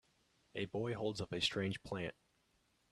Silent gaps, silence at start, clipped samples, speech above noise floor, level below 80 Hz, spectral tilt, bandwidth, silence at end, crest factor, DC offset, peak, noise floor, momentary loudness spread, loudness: none; 0.55 s; under 0.1%; 37 dB; -68 dBFS; -4.5 dB/octave; 13.5 kHz; 0.8 s; 20 dB; under 0.1%; -22 dBFS; -77 dBFS; 9 LU; -41 LUFS